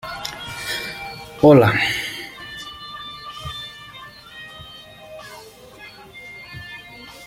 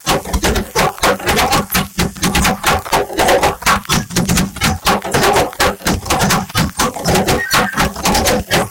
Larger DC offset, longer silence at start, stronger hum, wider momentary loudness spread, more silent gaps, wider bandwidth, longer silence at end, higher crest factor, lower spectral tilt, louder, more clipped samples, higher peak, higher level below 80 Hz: neither; about the same, 0.05 s vs 0.05 s; neither; first, 25 LU vs 4 LU; neither; about the same, 16.5 kHz vs 17.5 kHz; about the same, 0 s vs 0 s; first, 22 dB vs 14 dB; first, -5.5 dB/octave vs -3.5 dB/octave; second, -20 LUFS vs -14 LUFS; neither; about the same, -2 dBFS vs -2 dBFS; second, -50 dBFS vs -28 dBFS